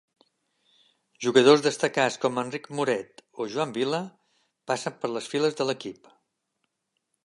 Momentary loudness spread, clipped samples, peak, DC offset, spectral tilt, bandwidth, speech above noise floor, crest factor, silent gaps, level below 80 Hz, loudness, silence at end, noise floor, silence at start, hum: 14 LU; under 0.1%; -4 dBFS; under 0.1%; -4 dB/octave; 11.5 kHz; 54 dB; 22 dB; none; -78 dBFS; -26 LUFS; 1.35 s; -79 dBFS; 1.2 s; none